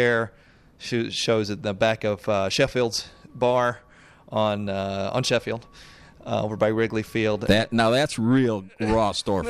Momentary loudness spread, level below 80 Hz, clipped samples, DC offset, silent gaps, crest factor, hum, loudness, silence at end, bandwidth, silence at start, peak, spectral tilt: 9 LU; -48 dBFS; under 0.1%; under 0.1%; none; 18 dB; none; -24 LUFS; 0 s; 14.5 kHz; 0 s; -6 dBFS; -5 dB/octave